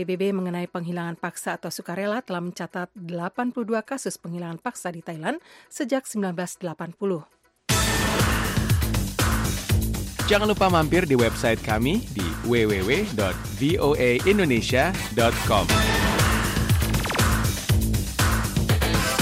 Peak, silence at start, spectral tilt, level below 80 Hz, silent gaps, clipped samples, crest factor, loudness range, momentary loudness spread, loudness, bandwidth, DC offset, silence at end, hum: -10 dBFS; 0 s; -4.5 dB/octave; -34 dBFS; none; under 0.1%; 14 dB; 9 LU; 11 LU; -24 LUFS; 16 kHz; under 0.1%; 0 s; none